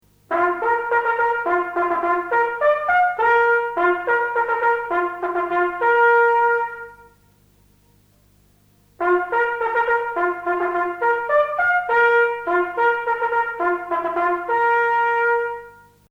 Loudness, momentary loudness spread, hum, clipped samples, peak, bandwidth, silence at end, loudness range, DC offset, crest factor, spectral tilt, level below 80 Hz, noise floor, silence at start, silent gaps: -19 LUFS; 7 LU; 50 Hz at -60 dBFS; under 0.1%; -6 dBFS; 7.4 kHz; 0.4 s; 5 LU; under 0.1%; 14 dB; -5.5 dB/octave; -58 dBFS; -56 dBFS; 0.3 s; none